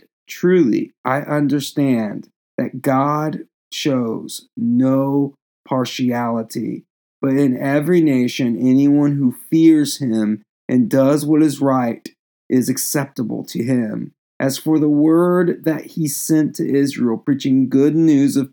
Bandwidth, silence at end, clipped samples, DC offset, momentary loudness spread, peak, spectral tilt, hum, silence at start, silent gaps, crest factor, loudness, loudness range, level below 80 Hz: over 20 kHz; 0.05 s; under 0.1%; under 0.1%; 12 LU; -2 dBFS; -6 dB/octave; none; 0.3 s; 0.98-1.04 s, 2.36-2.58 s, 3.54-3.71 s, 5.42-5.64 s, 6.90-7.20 s, 10.49-10.68 s, 12.19-12.50 s, 14.18-14.40 s; 14 dB; -17 LUFS; 5 LU; -80 dBFS